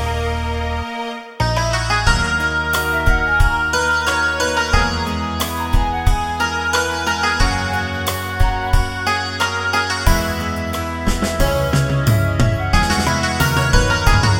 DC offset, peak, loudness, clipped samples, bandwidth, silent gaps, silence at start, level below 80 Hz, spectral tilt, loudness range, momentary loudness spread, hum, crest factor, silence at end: under 0.1%; 0 dBFS; -18 LUFS; under 0.1%; 17 kHz; none; 0 s; -22 dBFS; -4.5 dB/octave; 2 LU; 6 LU; none; 16 dB; 0 s